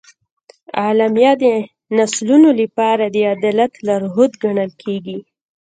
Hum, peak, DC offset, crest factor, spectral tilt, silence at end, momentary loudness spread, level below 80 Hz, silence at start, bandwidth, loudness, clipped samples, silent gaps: none; 0 dBFS; under 0.1%; 16 dB; -5 dB/octave; 0.45 s; 13 LU; -66 dBFS; 0.75 s; 9.4 kHz; -15 LUFS; under 0.1%; none